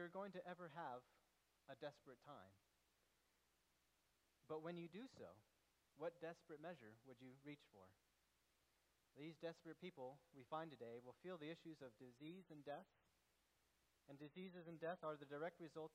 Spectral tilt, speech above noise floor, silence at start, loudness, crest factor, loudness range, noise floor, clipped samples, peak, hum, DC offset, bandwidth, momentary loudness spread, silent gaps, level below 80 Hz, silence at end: -6.5 dB/octave; 28 dB; 0 s; -57 LUFS; 20 dB; 5 LU; -85 dBFS; under 0.1%; -38 dBFS; none; under 0.1%; 11.5 kHz; 11 LU; none; under -90 dBFS; 0 s